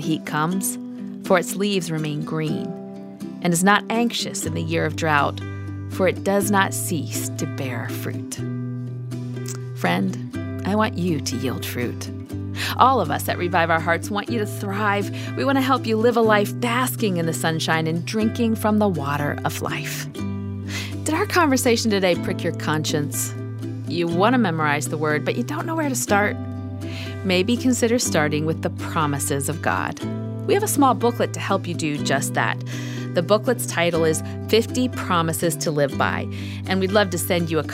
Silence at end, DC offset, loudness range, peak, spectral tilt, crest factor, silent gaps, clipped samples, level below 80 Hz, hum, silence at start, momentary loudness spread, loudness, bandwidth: 0 s; under 0.1%; 4 LU; 0 dBFS; -4.5 dB/octave; 20 dB; none; under 0.1%; -60 dBFS; none; 0 s; 11 LU; -22 LUFS; 16 kHz